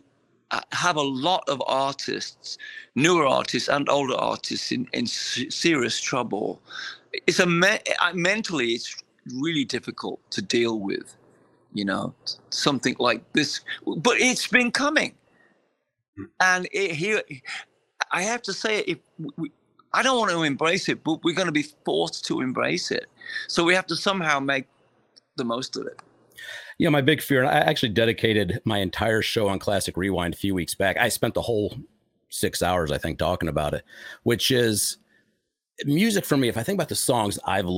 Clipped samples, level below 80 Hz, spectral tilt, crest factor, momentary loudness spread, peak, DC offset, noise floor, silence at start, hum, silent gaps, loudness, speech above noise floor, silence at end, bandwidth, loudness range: under 0.1%; -56 dBFS; -4 dB/octave; 22 dB; 13 LU; -2 dBFS; under 0.1%; -74 dBFS; 0.5 s; none; 16.08-16.13 s; -24 LUFS; 50 dB; 0 s; 16.5 kHz; 4 LU